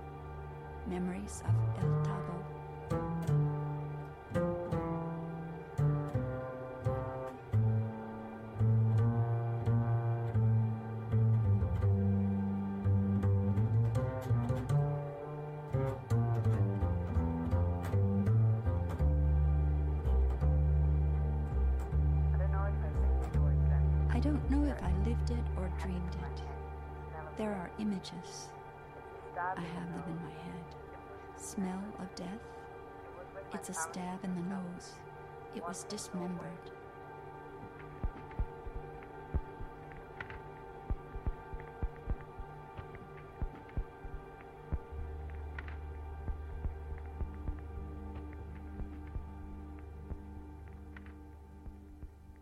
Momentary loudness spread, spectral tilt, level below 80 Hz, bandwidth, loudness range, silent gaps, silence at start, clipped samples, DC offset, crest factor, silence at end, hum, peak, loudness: 18 LU; -8 dB/octave; -40 dBFS; 12 kHz; 13 LU; none; 0 s; under 0.1%; under 0.1%; 14 dB; 0 s; none; -20 dBFS; -36 LUFS